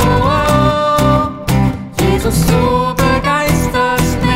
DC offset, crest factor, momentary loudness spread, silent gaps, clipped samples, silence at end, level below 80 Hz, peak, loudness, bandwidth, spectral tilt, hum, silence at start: under 0.1%; 12 dB; 3 LU; none; under 0.1%; 0 s; -24 dBFS; 0 dBFS; -13 LUFS; 16.5 kHz; -5.5 dB/octave; none; 0 s